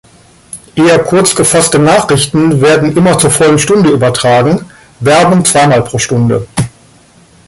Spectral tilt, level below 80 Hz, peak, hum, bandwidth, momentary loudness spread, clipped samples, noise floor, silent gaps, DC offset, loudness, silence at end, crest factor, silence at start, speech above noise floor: -4.5 dB/octave; -40 dBFS; 0 dBFS; none; 16 kHz; 9 LU; under 0.1%; -42 dBFS; none; under 0.1%; -8 LUFS; 0.8 s; 8 dB; 0.55 s; 34 dB